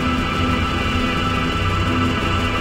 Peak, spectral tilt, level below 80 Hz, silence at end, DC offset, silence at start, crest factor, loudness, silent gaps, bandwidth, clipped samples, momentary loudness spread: -6 dBFS; -5.5 dB/octave; -28 dBFS; 0 s; under 0.1%; 0 s; 12 dB; -19 LUFS; none; 15.5 kHz; under 0.1%; 1 LU